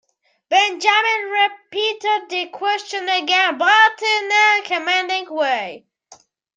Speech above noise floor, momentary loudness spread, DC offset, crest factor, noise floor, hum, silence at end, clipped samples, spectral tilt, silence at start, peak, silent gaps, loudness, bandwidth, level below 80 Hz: 32 dB; 9 LU; under 0.1%; 18 dB; -50 dBFS; none; 0.8 s; under 0.1%; 0 dB/octave; 0.5 s; -2 dBFS; none; -17 LUFS; 9.6 kHz; -82 dBFS